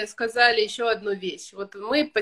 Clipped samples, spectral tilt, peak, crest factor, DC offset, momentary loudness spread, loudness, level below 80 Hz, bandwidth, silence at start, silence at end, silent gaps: under 0.1%; -2.5 dB/octave; -4 dBFS; 22 dB; under 0.1%; 16 LU; -23 LUFS; -66 dBFS; 12.5 kHz; 0 s; 0 s; none